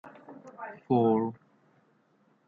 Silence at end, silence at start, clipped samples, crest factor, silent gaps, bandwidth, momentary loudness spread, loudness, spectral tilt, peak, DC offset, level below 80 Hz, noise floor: 1.15 s; 0.05 s; under 0.1%; 20 dB; none; 4.5 kHz; 25 LU; -27 LUFS; -10 dB/octave; -12 dBFS; under 0.1%; -78 dBFS; -68 dBFS